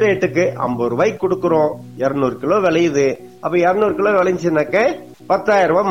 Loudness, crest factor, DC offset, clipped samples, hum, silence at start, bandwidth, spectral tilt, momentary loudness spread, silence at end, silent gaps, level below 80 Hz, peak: -17 LUFS; 12 dB; 0.3%; under 0.1%; none; 0 s; 16 kHz; -6 dB/octave; 6 LU; 0 s; none; -52 dBFS; -4 dBFS